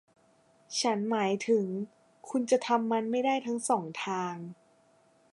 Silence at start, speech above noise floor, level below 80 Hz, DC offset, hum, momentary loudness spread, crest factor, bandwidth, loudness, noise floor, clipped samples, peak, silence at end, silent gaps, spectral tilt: 0.7 s; 36 dB; -84 dBFS; under 0.1%; none; 10 LU; 18 dB; 11.5 kHz; -30 LUFS; -65 dBFS; under 0.1%; -12 dBFS; 0.8 s; none; -4 dB/octave